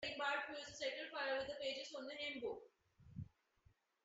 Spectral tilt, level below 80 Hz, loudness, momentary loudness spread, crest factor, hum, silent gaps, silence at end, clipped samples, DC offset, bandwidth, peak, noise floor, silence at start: -1 dB/octave; -76 dBFS; -45 LUFS; 14 LU; 18 dB; none; none; 0.8 s; under 0.1%; under 0.1%; 8 kHz; -30 dBFS; -76 dBFS; 0 s